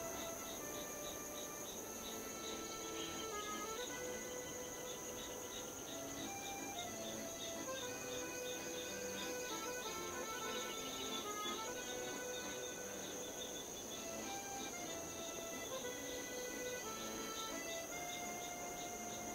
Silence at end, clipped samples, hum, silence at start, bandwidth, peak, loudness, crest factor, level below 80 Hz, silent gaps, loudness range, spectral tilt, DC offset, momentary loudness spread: 0 s; under 0.1%; none; 0 s; 16 kHz; -32 dBFS; -45 LUFS; 14 dB; -70 dBFS; none; 2 LU; -1.5 dB/octave; under 0.1%; 3 LU